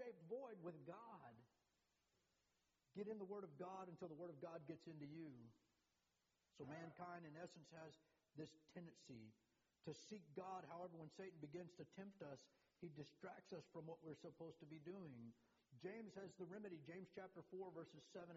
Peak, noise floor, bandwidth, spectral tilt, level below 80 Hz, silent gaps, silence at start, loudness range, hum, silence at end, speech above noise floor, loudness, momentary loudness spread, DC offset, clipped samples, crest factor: -40 dBFS; -89 dBFS; 7.4 kHz; -6 dB/octave; under -90 dBFS; none; 0 s; 4 LU; none; 0 s; 31 dB; -58 LUFS; 7 LU; under 0.1%; under 0.1%; 18 dB